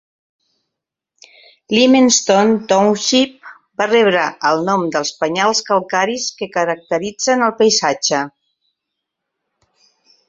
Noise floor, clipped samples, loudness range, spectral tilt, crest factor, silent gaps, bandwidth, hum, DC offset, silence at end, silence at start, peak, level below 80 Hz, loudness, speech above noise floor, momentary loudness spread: -81 dBFS; under 0.1%; 4 LU; -3 dB/octave; 16 dB; none; 8 kHz; none; under 0.1%; 2 s; 1.7 s; 0 dBFS; -62 dBFS; -15 LUFS; 66 dB; 9 LU